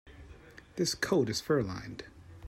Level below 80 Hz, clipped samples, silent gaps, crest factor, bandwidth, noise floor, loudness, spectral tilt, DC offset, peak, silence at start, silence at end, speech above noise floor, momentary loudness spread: -58 dBFS; under 0.1%; none; 20 dB; 16 kHz; -53 dBFS; -31 LUFS; -4.5 dB/octave; under 0.1%; -14 dBFS; 0.05 s; 0 s; 22 dB; 24 LU